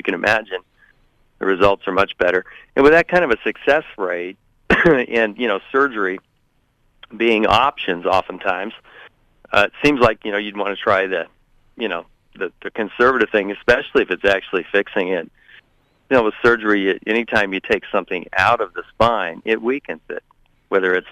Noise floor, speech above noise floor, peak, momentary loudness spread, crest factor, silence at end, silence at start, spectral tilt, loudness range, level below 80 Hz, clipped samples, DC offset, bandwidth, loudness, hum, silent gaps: -62 dBFS; 44 dB; -2 dBFS; 12 LU; 16 dB; 0 s; 0.05 s; -5.5 dB/octave; 3 LU; -46 dBFS; under 0.1%; under 0.1%; 14 kHz; -18 LUFS; none; none